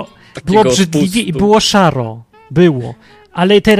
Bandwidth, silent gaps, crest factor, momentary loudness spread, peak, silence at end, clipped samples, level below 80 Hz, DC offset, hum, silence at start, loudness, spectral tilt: 15.5 kHz; none; 12 dB; 16 LU; 0 dBFS; 0 s; under 0.1%; -40 dBFS; under 0.1%; none; 0 s; -12 LUFS; -5 dB/octave